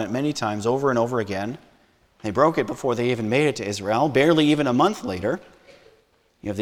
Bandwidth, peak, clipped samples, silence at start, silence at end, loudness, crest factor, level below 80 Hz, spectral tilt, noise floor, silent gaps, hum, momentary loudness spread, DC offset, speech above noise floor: 15 kHz; -4 dBFS; under 0.1%; 0 s; 0 s; -22 LUFS; 20 dB; -58 dBFS; -5.5 dB/octave; -61 dBFS; none; none; 13 LU; under 0.1%; 40 dB